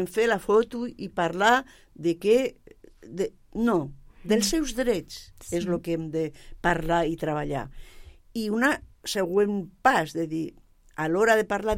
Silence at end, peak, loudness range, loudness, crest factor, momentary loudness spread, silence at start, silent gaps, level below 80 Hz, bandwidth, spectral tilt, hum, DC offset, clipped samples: 0 s; -6 dBFS; 3 LU; -26 LUFS; 20 dB; 12 LU; 0 s; none; -46 dBFS; 16.5 kHz; -4.5 dB/octave; none; under 0.1%; under 0.1%